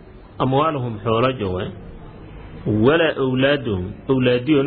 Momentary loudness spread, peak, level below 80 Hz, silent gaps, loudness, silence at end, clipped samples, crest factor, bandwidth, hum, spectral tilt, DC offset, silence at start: 22 LU; -4 dBFS; -44 dBFS; none; -20 LUFS; 0 s; under 0.1%; 16 dB; 4.8 kHz; none; -10.5 dB/octave; under 0.1%; 0.05 s